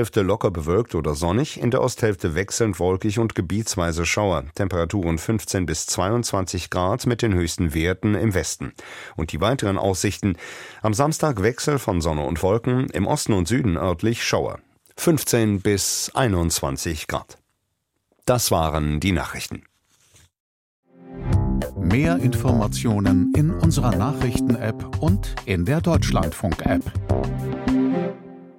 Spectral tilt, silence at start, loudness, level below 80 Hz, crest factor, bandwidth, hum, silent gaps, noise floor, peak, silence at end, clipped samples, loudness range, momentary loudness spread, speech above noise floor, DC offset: -5.5 dB/octave; 0 s; -22 LUFS; -36 dBFS; 18 dB; 16.5 kHz; none; 20.40-20.83 s; -74 dBFS; -4 dBFS; 0.05 s; under 0.1%; 4 LU; 7 LU; 53 dB; under 0.1%